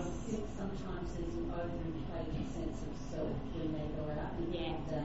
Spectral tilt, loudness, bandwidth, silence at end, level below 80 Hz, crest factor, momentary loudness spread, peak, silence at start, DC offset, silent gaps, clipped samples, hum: -6.5 dB/octave; -41 LUFS; 8 kHz; 0 s; -46 dBFS; 12 dB; 3 LU; -26 dBFS; 0 s; 0.5%; none; under 0.1%; none